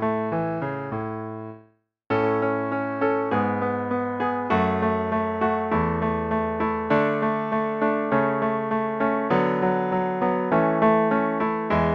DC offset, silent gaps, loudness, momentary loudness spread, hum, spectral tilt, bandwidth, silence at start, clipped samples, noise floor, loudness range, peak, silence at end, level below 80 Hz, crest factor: under 0.1%; none; -24 LUFS; 6 LU; none; -9 dB/octave; 6.2 kHz; 0 s; under 0.1%; -59 dBFS; 4 LU; -8 dBFS; 0 s; -50 dBFS; 16 dB